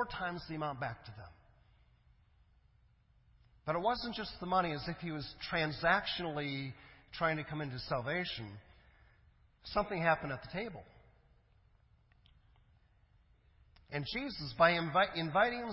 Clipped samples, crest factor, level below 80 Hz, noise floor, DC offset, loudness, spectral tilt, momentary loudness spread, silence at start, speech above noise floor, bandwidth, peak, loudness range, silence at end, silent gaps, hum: under 0.1%; 24 dB; -62 dBFS; -68 dBFS; under 0.1%; -36 LUFS; -8.5 dB/octave; 15 LU; 0 s; 32 dB; 5.8 kHz; -14 dBFS; 11 LU; 0 s; none; none